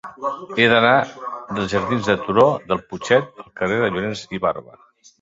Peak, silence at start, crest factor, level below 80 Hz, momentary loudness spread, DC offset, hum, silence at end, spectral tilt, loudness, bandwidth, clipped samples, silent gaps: -2 dBFS; 0.05 s; 18 dB; -52 dBFS; 13 LU; under 0.1%; none; 0.6 s; -5.5 dB/octave; -19 LUFS; 7.8 kHz; under 0.1%; none